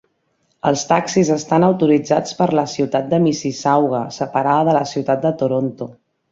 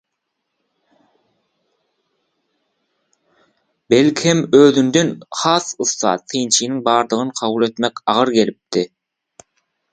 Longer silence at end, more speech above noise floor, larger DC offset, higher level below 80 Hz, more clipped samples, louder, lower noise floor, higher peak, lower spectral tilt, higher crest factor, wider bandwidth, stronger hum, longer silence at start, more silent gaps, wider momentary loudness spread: second, 0.4 s vs 1.05 s; second, 49 dB vs 60 dB; neither; about the same, -58 dBFS vs -62 dBFS; neither; about the same, -17 LUFS vs -16 LUFS; second, -65 dBFS vs -76 dBFS; about the same, -2 dBFS vs 0 dBFS; first, -6 dB/octave vs -4 dB/octave; about the same, 16 dB vs 18 dB; second, 7.8 kHz vs 9.6 kHz; neither; second, 0.65 s vs 3.9 s; neither; about the same, 7 LU vs 9 LU